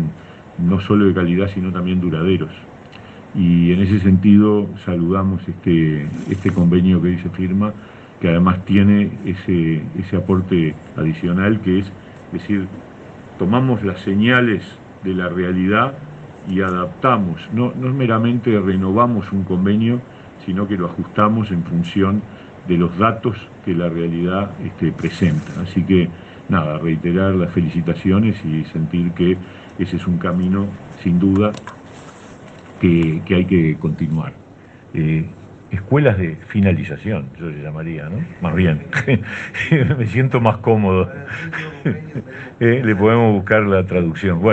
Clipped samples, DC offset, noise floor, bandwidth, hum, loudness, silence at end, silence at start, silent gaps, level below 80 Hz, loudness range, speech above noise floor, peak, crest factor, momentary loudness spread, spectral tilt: under 0.1%; under 0.1%; -42 dBFS; 7.8 kHz; none; -17 LUFS; 0 s; 0 s; none; -48 dBFS; 4 LU; 25 dB; 0 dBFS; 16 dB; 13 LU; -9 dB/octave